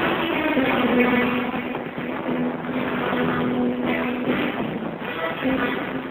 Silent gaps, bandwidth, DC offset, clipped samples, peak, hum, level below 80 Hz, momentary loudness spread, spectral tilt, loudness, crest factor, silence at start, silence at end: none; 15 kHz; under 0.1%; under 0.1%; -6 dBFS; none; -52 dBFS; 9 LU; -8 dB/octave; -23 LUFS; 16 dB; 0 s; 0 s